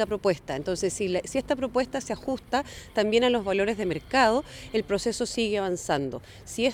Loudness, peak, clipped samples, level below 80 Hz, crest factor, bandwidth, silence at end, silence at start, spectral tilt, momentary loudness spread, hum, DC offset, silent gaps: -27 LUFS; -10 dBFS; under 0.1%; -50 dBFS; 18 dB; 16 kHz; 0 s; 0 s; -4 dB/octave; 9 LU; none; under 0.1%; none